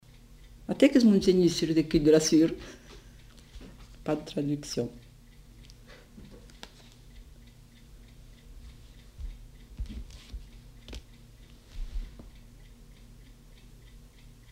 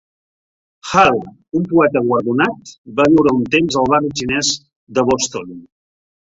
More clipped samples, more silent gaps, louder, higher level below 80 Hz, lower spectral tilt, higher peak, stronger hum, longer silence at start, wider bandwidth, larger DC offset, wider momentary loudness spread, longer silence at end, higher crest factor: neither; second, none vs 2.78-2.84 s, 4.76-4.87 s; second, -25 LUFS vs -16 LUFS; about the same, -46 dBFS vs -48 dBFS; about the same, -5.5 dB/octave vs -4.5 dB/octave; second, -8 dBFS vs 0 dBFS; neither; second, 0.7 s vs 0.85 s; first, 16 kHz vs 8 kHz; neither; first, 29 LU vs 12 LU; first, 2.25 s vs 0.7 s; first, 22 dB vs 16 dB